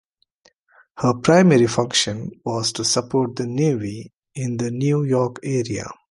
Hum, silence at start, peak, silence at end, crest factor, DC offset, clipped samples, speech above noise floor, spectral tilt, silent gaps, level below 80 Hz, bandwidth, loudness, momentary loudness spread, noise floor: none; 0.95 s; 0 dBFS; 0.2 s; 20 dB; under 0.1%; under 0.1%; 40 dB; -5 dB/octave; 4.14-4.22 s; -56 dBFS; 11.5 kHz; -20 LUFS; 14 LU; -60 dBFS